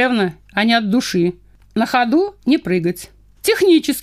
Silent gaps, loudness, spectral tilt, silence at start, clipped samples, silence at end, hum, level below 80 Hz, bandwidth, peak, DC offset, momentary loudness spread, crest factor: none; -17 LUFS; -5 dB/octave; 0 s; under 0.1%; 0 s; none; -50 dBFS; 15.5 kHz; -2 dBFS; under 0.1%; 8 LU; 14 dB